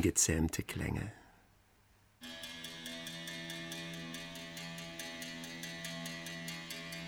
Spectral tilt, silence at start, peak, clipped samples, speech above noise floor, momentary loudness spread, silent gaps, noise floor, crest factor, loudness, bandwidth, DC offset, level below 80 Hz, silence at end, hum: -3 dB/octave; 0 s; -16 dBFS; under 0.1%; 34 dB; 10 LU; none; -67 dBFS; 24 dB; -40 LUFS; over 20 kHz; under 0.1%; -58 dBFS; 0 s; none